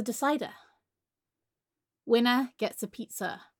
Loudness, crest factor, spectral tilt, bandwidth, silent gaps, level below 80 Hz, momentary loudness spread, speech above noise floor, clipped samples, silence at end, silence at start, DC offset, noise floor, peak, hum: -29 LUFS; 20 dB; -3.5 dB/octave; 17.5 kHz; none; -82 dBFS; 14 LU; 60 dB; under 0.1%; 0.15 s; 0 s; under 0.1%; -90 dBFS; -12 dBFS; none